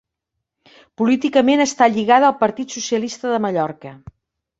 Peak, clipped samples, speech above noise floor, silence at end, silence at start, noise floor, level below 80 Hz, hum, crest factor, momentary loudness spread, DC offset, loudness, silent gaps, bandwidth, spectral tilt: -2 dBFS; under 0.1%; 62 dB; 0.65 s; 1 s; -79 dBFS; -60 dBFS; none; 18 dB; 12 LU; under 0.1%; -17 LUFS; none; 8 kHz; -4 dB/octave